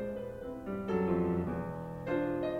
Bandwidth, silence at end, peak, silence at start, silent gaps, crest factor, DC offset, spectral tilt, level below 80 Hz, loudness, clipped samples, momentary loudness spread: 11.5 kHz; 0 s; -20 dBFS; 0 s; none; 14 dB; under 0.1%; -9 dB/octave; -56 dBFS; -35 LUFS; under 0.1%; 10 LU